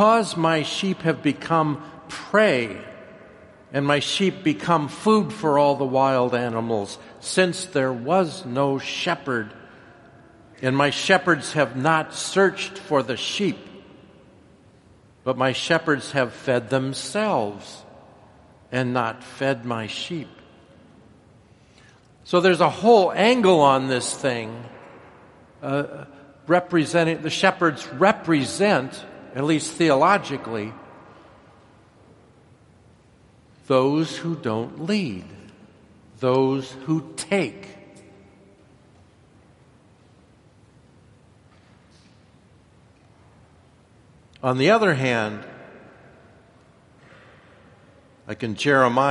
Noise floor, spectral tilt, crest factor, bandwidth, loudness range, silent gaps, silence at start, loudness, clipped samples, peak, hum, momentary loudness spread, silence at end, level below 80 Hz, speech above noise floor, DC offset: -54 dBFS; -5 dB/octave; 22 dB; 11.5 kHz; 8 LU; none; 0 s; -22 LUFS; under 0.1%; -2 dBFS; none; 16 LU; 0 s; -64 dBFS; 33 dB; under 0.1%